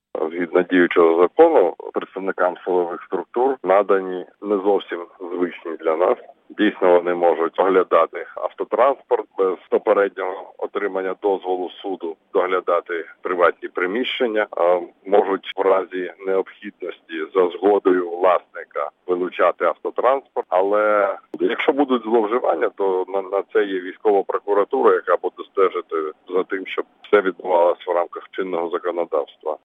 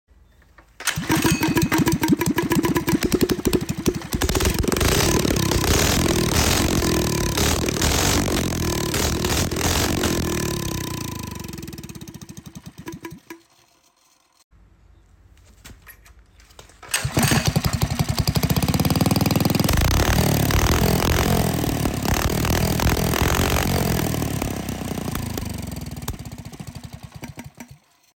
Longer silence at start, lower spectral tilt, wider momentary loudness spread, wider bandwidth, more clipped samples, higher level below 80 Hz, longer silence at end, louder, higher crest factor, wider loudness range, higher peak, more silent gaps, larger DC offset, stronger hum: second, 0.15 s vs 0.8 s; first, -7 dB/octave vs -4.5 dB/octave; second, 11 LU vs 18 LU; second, 4 kHz vs 17 kHz; neither; second, -70 dBFS vs -32 dBFS; second, 0.1 s vs 0.4 s; about the same, -20 LUFS vs -21 LUFS; about the same, 18 dB vs 16 dB; second, 3 LU vs 12 LU; first, -2 dBFS vs -6 dBFS; second, none vs 14.44-14.51 s; neither; neither